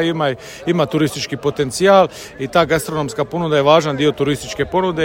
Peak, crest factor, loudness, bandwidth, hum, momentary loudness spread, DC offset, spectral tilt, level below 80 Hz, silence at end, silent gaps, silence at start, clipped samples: 0 dBFS; 16 dB; -17 LUFS; 16.5 kHz; none; 9 LU; under 0.1%; -5 dB/octave; -46 dBFS; 0 s; none; 0 s; under 0.1%